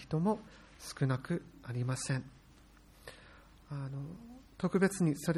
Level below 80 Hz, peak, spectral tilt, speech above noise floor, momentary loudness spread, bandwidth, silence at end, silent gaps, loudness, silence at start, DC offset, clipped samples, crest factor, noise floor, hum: -62 dBFS; -16 dBFS; -6 dB/octave; 25 dB; 23 LU; 13.5 kHz; 0 s; none; -36 LUFS; 0 s; under 0.1%; under 0.1%; 20 dB; -60 dBFS; none